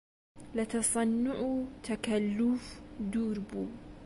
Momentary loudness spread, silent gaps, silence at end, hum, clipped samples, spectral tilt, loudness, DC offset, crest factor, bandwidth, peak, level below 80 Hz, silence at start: 10 LU; none; 0 s; none; under 0.1%; -4.5 dB/octave; -33 LUFS; under 0.1%; 14 dB; 11.5 kHz; -18 dBFS; -56 dBFS; 0.35 s